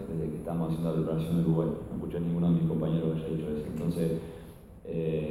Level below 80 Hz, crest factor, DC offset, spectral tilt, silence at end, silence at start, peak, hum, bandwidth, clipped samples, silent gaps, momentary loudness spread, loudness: -50 dBFS; 14 dB; under 0.1%; -9 dB/octave; 0 s; 0 s; -16 dBFS; none; 13 kHz; under 0.1%; none; 10 LU; -31 LUFS